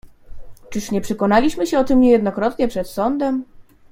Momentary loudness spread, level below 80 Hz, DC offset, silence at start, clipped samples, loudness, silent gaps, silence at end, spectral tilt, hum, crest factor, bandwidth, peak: 10 LU; -40 dBFS; under 0.1%; 0.05 s; under 0.1%; -18 LUFS; none; 0.3 s; -6 dB/octave; none; 16 dB; 16 kHz; -2 dBFS